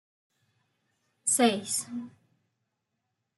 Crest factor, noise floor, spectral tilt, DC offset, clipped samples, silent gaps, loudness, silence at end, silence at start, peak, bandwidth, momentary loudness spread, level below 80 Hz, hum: 24 dB; -82 dBFS; -2 dB/octave; under 0.1%; under 0.1%; none; -27 LUFS; 1.3 s; 1.25 s; -10 dBFS; 12.5 kHz; 17 LU; -82 dBFS; none